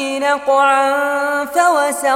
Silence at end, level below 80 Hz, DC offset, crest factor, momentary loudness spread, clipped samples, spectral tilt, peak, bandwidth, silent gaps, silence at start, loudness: 0 s; -60 dBFS; under 0.1%; 12 dB; 5 LU; under 0.1%; -0.5 dB/octave; -2 dBFS; 16.5 kHz; none; 0 s; -15 LUFS